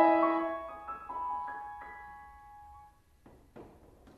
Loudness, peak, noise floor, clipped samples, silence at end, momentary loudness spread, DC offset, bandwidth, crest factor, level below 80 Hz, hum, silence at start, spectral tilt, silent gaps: -34 LUFS; -12 dBFS; -60 dBFS; under 0.1%; 0.5 s; 25 LU; under 0.1%; 5 kHz; 22 dB; -64 dBFS; none; 0 s; -7 dB/octave; none